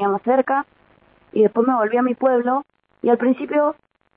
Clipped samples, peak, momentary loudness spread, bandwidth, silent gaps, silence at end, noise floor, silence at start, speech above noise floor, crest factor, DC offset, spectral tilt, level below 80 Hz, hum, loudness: under 0.1%; -4 dBFS; 7 LU; 3.9 kHz; none; 0.45 s; -55 dBFS; 0 s; 37 dB; 16 dB; under 0.1%; -11 dB/octave; -68 dBFS; none; -19 LUFS